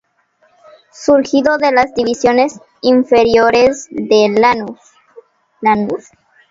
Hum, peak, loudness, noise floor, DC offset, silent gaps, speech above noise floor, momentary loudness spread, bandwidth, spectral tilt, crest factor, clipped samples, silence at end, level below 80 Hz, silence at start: none; 0 dBFS; -13 LUFS; -57 dBFS; under 0.1%; none; 45 dB; 10 LU; 7.8 kHz; -4.5 dB/octave; 14 dB; under 0.1%; 0.5 s; -50 dBFS; 1 s